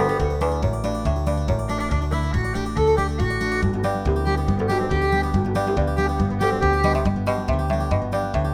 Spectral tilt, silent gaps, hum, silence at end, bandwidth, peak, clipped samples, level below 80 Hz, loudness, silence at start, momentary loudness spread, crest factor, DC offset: -7 dB/octave; none; none; 0 s; 15 kHz; -6 dBFS; under 0.1%; -28 dBFS; -22 LUFS; 0 s; 4 LU; 14 dB; under 0.1%